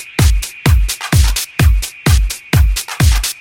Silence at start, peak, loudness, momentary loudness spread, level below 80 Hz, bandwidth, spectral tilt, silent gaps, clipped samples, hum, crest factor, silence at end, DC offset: 0 s; 0 dBFS; -14 LUFS; 3 LU; -14 dBFS; 17.5 kHz; -4 dB/octave; none; under 0.1%; none; 12 dB; 0.05 s; under 0.1%